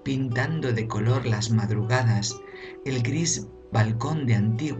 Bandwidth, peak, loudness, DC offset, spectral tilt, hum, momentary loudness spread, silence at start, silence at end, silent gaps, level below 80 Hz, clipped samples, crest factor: 8.6 kHz; -10 dBFS; -25 LUFS; under 0.1%; -5.5 dB/octave; none; 7 LU; 0 s; 0 s; none; -52 dBFS; under 0.1%; 16 dB